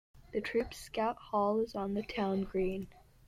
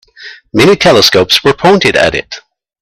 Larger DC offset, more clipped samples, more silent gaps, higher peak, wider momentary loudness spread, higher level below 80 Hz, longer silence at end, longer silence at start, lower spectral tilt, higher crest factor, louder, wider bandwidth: neither; second, under 0.1% vs 0.4%; neither; second, -20 dBFS vs 0 dBFS; second, 8 LU vs 13 LU; second, -56 dBFS vs -40 dBFS; second, 0.3 s vs 0.45 s; about the same, 0.15 s vs 0.2 s; first, -6 dB/octave vs -4 dB/octave; about the same, 14 dB vs 10 dB; second, -35 LUFS vs -8 LUFS; about the same, 15 kHz vs 16.5 kHz